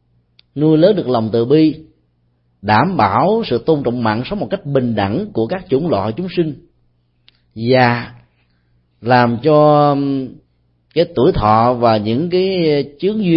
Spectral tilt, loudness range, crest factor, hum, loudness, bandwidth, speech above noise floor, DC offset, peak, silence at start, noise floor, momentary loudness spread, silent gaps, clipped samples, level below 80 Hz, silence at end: -11 dB/octave; 5 LU; 16 dB; 60 Hz at -45 dBFS; -15 LUFS; 5.8 kHz; 46 dB; under 0.1%; 0 dBFS; 0.55 s; -60 dBFS; 10 LU; none; under 0.1%; -42 dBFS; 0 s